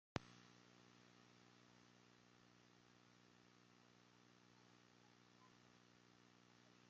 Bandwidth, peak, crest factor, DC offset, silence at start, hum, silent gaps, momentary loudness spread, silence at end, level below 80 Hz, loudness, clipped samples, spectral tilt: 7.4 kHz; -24 dBFS; 40 dB; under 0.1%; 0.15 s; 60 Hz at -75 dBFS; none; 16 LU; 0 s; -84 dBFS; -62 LUFS; under 0.1%; -4 dB/octave